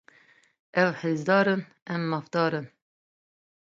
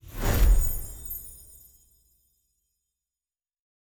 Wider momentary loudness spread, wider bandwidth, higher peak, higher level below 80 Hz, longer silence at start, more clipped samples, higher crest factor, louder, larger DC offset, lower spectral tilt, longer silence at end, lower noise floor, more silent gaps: second, 11 LU vs 22 LU; second, 7.6 kHz vs over 20 kHz; about the same, -8 dBFS vs -10 dBFS; second, -76 dBFS vs -30 dBFS; first, 0.75 s vs 0.05 s; neither; about the same, 22 dB vs 18 dB; about the same, -26 LUFS vs -28 LUFS; neither; first, -7 dB/octave vs -5 dB/octave; second, 1.1 s vs 2.55 s; second, -60 dBFS vs under -90 dBFS; first, 1.82-1.86 s vs none